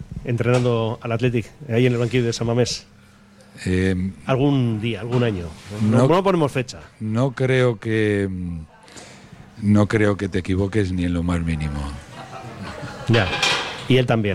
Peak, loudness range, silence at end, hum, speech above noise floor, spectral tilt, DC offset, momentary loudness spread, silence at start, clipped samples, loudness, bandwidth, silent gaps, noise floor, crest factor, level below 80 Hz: -6 dBFS; 3 LU; 0 s; none; 29 dB; -6 dB/octave; under 0.1%; 15 LU; 0 s; under 0.1%; -21 LUFS; 12.5 kHz; none; -49 dBFS; 16 dB; -42 dBFS